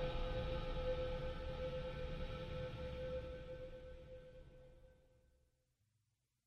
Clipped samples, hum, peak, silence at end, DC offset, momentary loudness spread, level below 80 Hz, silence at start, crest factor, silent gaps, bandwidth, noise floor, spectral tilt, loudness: under 0.1%; none; -30 dBFS; 1.55 s; under 0.1%; 16 LU; -50 dBFS; 0 s; 16 dB; none; 8 kHz; -85 dBFS; -7 dB/octave; -46 LUFS